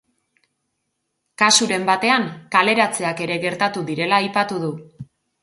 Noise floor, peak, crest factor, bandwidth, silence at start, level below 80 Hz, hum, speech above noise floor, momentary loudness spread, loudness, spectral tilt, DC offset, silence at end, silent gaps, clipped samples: -75 dBFS; 0 dBFS; 20 dB; 11.5 kHz; 1.4 s; -66 dBFS; none; 56 dB; 9 LU; -18 LUFS; -2.5 dB/octave; under 0.1%; 0.4 s; none; under 0.1%